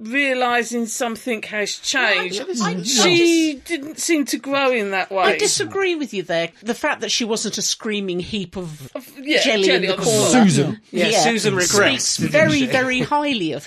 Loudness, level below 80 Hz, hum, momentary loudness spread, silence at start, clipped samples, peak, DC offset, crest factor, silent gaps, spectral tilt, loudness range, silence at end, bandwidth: -18 LUFS; -56 dBFS; none; 10 LU; 0 s; under 0.1%; -2 dBFS; under 0.1%; 18 dB; none; -3 dB/octave; 5 LU; 0 s; 14 kHz